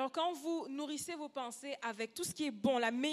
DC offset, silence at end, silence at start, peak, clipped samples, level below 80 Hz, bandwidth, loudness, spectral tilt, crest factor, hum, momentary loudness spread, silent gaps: under 0.1%; 0 s; 0 s; -20 dBFS; under 0.1%; -80 dBFS; 15 kHz; -39 LUFS; -3 dB/octave; 18 dB; none; 9 LU; none